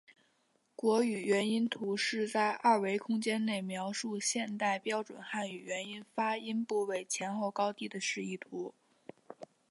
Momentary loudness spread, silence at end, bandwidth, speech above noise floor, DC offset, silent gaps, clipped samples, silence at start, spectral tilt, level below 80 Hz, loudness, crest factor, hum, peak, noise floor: 11 LU; 0.25 s; 11.5 kHz; 41 dB; under 0.1%; none; under 0.1%; 0.8 s; -3.5 dB/octave; -86 dBFS; -34 LUFS; 20 dB; none; -14 dBFS; -75 dBFS